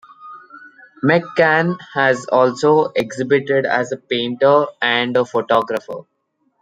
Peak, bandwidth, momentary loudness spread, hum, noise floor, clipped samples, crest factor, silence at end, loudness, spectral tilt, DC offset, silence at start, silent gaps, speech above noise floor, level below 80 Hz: -2 dBFS; 9.2 kHz; 7 LU; none; -42 dBFS; under 0.1%; 16 dB; 0.6 s; -17 LUFS; -5.5 dB/octave; under 0.1%; 0.2 s; none; 26 dB; -64 dBFS